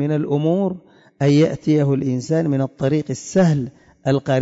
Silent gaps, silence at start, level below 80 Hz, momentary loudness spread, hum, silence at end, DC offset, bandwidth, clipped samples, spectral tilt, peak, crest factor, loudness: none; 0 s; -56 dBFS; 7 LU; none; 0 s; under 0.1%; 8 kHz; under 0.1%; -7.5 dB/octave; -6 dBFS; 12 dB; -19 LUFS